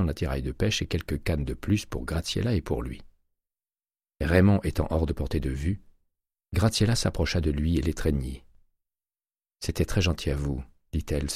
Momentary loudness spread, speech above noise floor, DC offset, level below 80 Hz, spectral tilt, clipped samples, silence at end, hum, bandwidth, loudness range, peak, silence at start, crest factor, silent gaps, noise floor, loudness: 11 LU; over 64 dB; under 0.1%; -36 dBFS; -5.5 dB/octave; under 0.1%; 0 s; none; 15 kHz; 4 LU; -6 dBFS; 0 s; 22 dB; none; under -90 dBFS; -28 LUFS